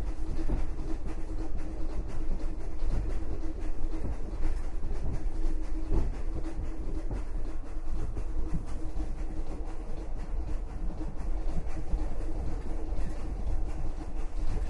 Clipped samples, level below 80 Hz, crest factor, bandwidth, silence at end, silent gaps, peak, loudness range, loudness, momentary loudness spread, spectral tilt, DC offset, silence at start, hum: under 0.1%; -30 dBFS; 14 dB; 6.2 kHz; 0 s; none; -14 dBFS; 2 LU; -38 LUFS; 4 LU; -7.5 dB/octave; under 0.1%; 0 s; none